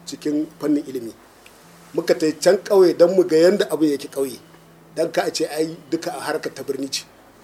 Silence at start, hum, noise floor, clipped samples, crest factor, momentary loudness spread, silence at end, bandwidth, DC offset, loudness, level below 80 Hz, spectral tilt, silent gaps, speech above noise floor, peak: 0.05 s; none; -47 dBFS; under 0.1%; 20 dB; 13 LU; 0.4 s; 16 kHz; under 0.1%; -20 LUFS; -66 dBFS; -4.5 dB/octave; none; 28 dB; -2 dBFS